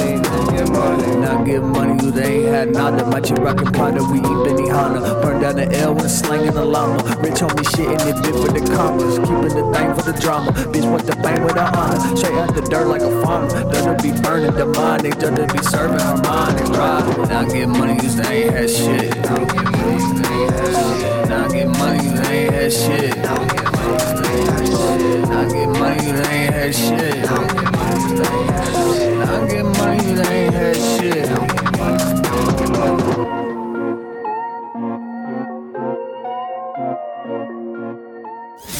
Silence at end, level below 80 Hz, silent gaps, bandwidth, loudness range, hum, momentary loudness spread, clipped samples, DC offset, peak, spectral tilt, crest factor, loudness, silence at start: 0 s; -36 dBFS; none; 17.5 kHz; 4 LU; none; 9 LU; under 0.1%; under 0.1%; -6 dBFS; -5.5 dB/octave; 10 dB; -17 LUFS; 0 s